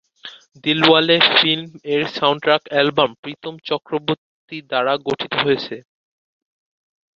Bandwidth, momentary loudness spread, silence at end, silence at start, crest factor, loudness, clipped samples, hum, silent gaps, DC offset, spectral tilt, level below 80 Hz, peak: 7.4 kHz; 20 LU; 1.4 s; 0.25 s; 20 dB; -17 LUFS; under 0.1%; none; 3.18-3.23 s, 4.18-4.48 s; under 0.1%; -5.5 dB/octave; -62 dBFS; 0 dBFS